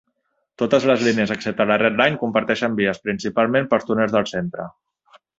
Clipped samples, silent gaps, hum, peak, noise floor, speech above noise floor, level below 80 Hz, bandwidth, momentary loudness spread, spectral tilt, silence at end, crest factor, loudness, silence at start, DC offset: under 0.1%; none; none; -2 dBFS; -71 dBFS; 52 dB; -58 dBFS; 7.8 kHz; 9 LU; -5.5 dB/octave; 0.7 s; 18 dB; -20 LUFS; 0.6 s; under 0.1%